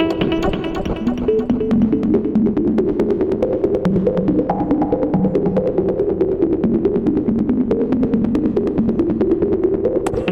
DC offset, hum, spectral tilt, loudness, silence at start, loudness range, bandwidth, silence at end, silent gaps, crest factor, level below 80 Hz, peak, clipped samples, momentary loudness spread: under 0.1%; none; -8.5 dB/octave; -18 LUFS; 0 s; 1 LU; 11.5 kHz; 0 s; none; 12 dB; -36 dBFS; -6 dBFS; under 0.1%; 2 LU